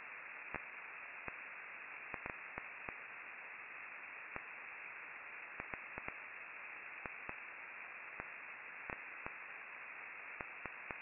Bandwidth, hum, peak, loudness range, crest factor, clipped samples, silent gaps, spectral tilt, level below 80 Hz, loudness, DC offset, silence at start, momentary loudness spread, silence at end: 3.6 kHz; none; -22 dBFS; 1 LU; 28 dB; under 0.1%; none; 2 dB/octave; -74 dBFS; -48 LUFS; under 0.1%; 0 s; 2 LU; 0 s